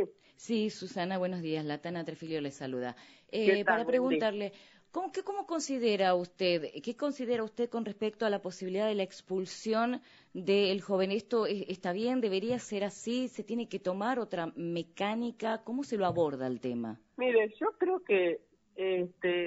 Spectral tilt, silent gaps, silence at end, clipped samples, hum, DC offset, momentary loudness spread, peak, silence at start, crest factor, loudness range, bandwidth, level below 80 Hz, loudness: -4 dB/octave; none; 0 s; under 0.1%; none; under 0.1%; 10 LU; -14 dBFS; 0 s; 20 dB; 3 LU; 7.6 kHz; -78 dBFS; -33 LUFS